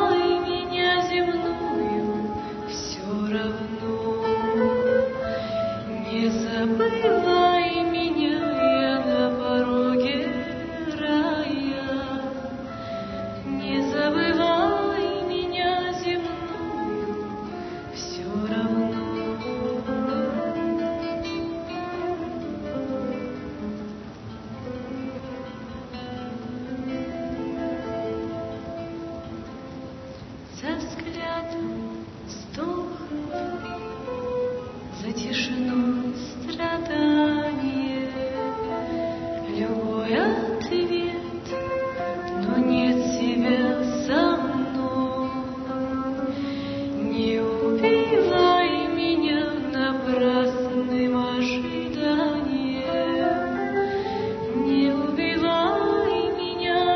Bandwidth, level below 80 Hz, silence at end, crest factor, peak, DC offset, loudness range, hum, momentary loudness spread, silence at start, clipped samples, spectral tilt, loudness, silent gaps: 6.4 kHz; -50 dBFS; 0 s; 18 dB; -6 dBFS; under 0.1%; 10 LU; none; 13 LU; 0 s; under 0.1%; -5.5 dB/octave; -25 LUFS; none